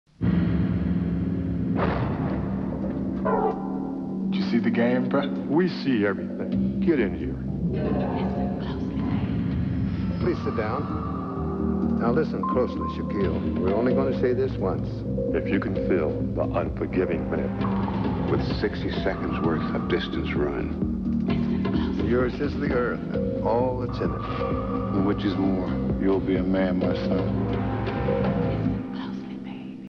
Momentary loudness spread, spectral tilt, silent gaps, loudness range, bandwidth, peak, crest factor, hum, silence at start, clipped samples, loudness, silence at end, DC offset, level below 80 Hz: 5 LU; -9.5 dB/octave; none; 2 LU; 6.2 kHz; -10 dBFS; 14 dB; none; 0.2 s; under 0.1%; -26 LUFS; 0 s; under 0.1%; -38 dBFS